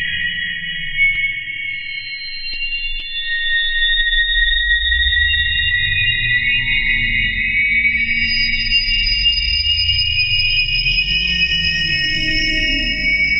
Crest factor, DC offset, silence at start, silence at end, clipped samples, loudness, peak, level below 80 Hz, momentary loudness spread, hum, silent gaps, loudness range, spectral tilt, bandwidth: 14 dB; under 0.1%; 0 s; 0 s; under 0.1%; -15 LUFS; -4 dBFS; -28 dBFS; 8 LU; none; none; 4 LU; -3 dB/octave; 8 kHz